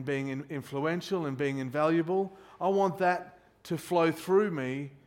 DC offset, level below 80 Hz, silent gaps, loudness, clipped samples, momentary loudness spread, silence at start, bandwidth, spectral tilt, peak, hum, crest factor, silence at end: under 0.1%; -72 dBFS; none; -30 LUFS; under 0.1%; 10 LU; 0 s; 16.5 kHz; -6.5 dB/octave; -14 dBFS; none; 16 dB; 0.1 s